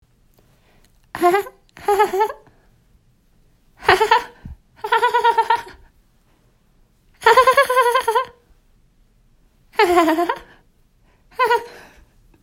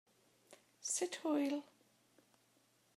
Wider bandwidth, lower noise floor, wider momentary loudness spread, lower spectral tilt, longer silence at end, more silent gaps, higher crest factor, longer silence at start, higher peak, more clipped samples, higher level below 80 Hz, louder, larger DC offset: about the same, 16.5 kHz vs 15.5 kHz; second, -57 dBFS vs -74 dBFS; first, 19 LU vs 8 LU; first, -3 dB/octave vs -1.5 dB/octave; second, 0.65 s vs 1.35 s; neither; about the same, 20 dB vs 18 dB; first, 1.15 s vs 0.5 s; first, 0 dBFS vs -26 dBFS; neither; first, -52 dBFS vs under -90 dBFS; first, -17 LUFS vs -40 LUFS; neither